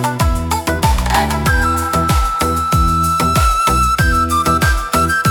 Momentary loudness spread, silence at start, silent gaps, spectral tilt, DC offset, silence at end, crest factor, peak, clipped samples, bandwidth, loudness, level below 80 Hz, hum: 3 LU; 0 s; none; -4.5 dB/octave; under 0.1%; 0 s; 14 dB; 0 dBFS; under 0.1%; 19 kHz; -14 LUFS; -20 dBFS; none